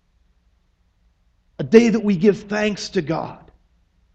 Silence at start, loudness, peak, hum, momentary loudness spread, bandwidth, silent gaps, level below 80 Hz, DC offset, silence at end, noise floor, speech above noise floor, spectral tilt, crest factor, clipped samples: 1.6 s; -18 LUFS; 0 dBFS; none; 13 LU; 8.2 kHz; none; -54 dBFS; under 0.1%; 0.8 s; -62 dBFS; 45 dB; -6 dB/octave; 22 dB; under 0.1%